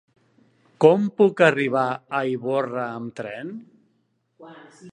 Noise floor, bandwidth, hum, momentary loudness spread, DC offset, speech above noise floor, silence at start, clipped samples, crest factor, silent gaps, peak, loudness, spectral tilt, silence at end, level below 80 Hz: -69 dBFS; 9.6 kHz; none; 16 LU; under 0.1%; 48 dB; 0.8 s; under 0.1%; 22 dB; none; 0 dBFS; -21 LUFS; -7 dB/octave; 0 s; -74 dBFS